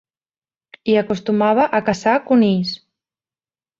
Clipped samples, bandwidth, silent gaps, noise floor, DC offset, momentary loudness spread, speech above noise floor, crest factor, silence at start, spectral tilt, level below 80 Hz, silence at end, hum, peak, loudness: under 0.1%; 7.6 kHz; none; under -90 dBFS; under 0.1%; 10 LU; over 74 dB; 16 dB; 0.85 s; -6.5 dB/octave; -58 dBFS; 1.05 s; none; -2 dBFS; -17 LUFS